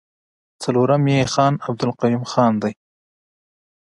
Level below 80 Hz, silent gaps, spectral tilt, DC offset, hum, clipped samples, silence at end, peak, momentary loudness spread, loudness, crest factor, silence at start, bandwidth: -56 dBFS; none; -6.5 dB/octave; under 0.1%; none; under 0.1%; 1.25 s; -2 dBFS; 7 LU; -19 LUFS; 20 dB; 0.6 s; 11.5 kHz